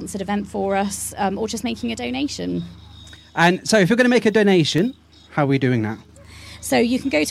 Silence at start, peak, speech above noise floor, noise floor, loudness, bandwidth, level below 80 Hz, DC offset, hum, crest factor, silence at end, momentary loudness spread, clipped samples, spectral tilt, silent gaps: 0 s; -2 dBFS; 23 dB; -43 dBFS; -20 LUFS; 15.5 kHz; -48 dBFS; under 0.1%; none; 18 dB; 0 s; 13 LU; under 0.1%; -5 dB/octave; none